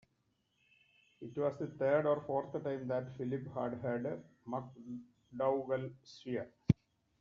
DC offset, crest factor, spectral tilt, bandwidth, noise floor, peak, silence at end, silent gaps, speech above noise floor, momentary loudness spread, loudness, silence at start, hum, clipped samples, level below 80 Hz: under 0.1%; 28 dB; -7.5 dB/octave; 7.2 kHz; -79 dBFS; -12 dBFS; 0.5 s; none; 42 dB; 15 LU; -38 LUFS; 1.2 s; none; under 0.1%; -66 dBFS